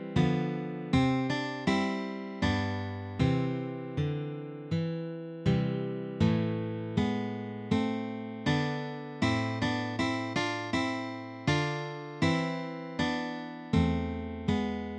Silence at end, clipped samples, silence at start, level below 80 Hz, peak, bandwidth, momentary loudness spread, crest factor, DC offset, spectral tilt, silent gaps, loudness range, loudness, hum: 0 s; under 0.1%; 0 s; -50 dBFS; -12 dBFS; 9.8 kHz; 8 LU; 18 dB; under 0.1%; -6.5 dB/octave; none; 2 LU; -32 LUFS; none